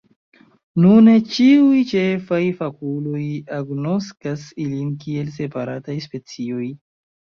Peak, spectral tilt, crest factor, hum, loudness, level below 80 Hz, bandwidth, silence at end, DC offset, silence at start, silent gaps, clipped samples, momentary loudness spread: -2 dBFS; -7.5 dB/octave; 16 dB; none; -19 LUFS; -60 dBFS; 6.8 kHz; 0.6 s; under 0.1%; 0.75 s; none; under 0.1%; 16 LU